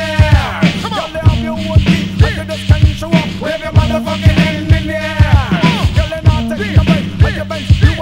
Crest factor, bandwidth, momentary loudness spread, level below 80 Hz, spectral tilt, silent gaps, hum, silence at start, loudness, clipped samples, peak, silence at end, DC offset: 12 dB; 12.5 kHz; 6 LU; -20 dBFS; -6.5 dB/octave; none; none; 0 s; -13 LUFS; 2%; 0 dBFS; 0 s; under 0.1%